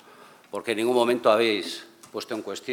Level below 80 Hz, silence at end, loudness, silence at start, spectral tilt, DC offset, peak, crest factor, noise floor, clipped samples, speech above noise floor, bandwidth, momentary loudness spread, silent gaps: -84 dBFS; 0 s; -24 LUFS; 0.55 s; -4 dB/octave; under 0.1%; -6 dBFS; 20 dB; -51 dBFS; under 0.1%; 27 dB; 17.5 kHz; 17 LU; none